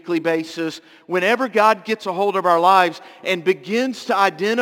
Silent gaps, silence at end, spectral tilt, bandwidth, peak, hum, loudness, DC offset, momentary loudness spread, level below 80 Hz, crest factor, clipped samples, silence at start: none; 0 s; -4.5 dB/octave; 17 kHz; -2 dBFS; none; -19 LUFS; under 0.1%; 11 LU; -72 dBFS; 18 dB; under 0.1%; 0.05 s